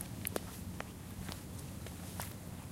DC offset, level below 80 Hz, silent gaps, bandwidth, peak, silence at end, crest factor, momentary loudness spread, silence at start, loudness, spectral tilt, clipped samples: under 0.1%; -56 dBFS; none; 17 kHz; -18 dBFS; 0 s; 28 dB; 6 LU; 0 s; -44 LUFS; -4.5 dB/octave; under 0.1%